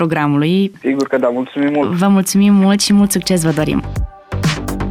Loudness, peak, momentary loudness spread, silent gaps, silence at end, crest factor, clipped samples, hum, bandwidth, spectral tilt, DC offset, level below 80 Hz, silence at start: -14 LUFS; -4 dBFS; 8 LU; none; 0 s; 10 dB; under 0.1%; none; 16 kHz; -5.5 dB/octave; under 0.1%; -32 dBFS; 0 s